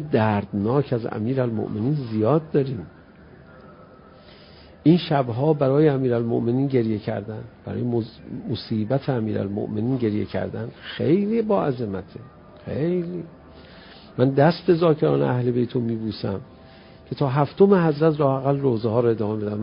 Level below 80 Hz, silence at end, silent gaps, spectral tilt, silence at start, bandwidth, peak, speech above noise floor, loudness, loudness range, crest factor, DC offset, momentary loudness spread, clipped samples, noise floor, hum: -52 dBFS; 0 s; none; -12.5 dB/octave; 0 s; 5.4 kHz; -4 dBFS; 26 dB; -22 LUFS; 5 LU; 20 dB; under 0.1%; 15 LU; under 0.1%; -47 dBFS; none